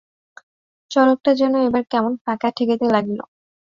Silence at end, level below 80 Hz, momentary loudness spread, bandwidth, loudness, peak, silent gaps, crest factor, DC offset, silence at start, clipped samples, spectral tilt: 0.55 s; -62 dBFS; 7 LU; 7.4 kHz; -19 LUFS; -4 dBFS; 2.21-2.25 s; 16 dB; under 0.1%; 0.9 s; under 0.1%; -6 dB/octave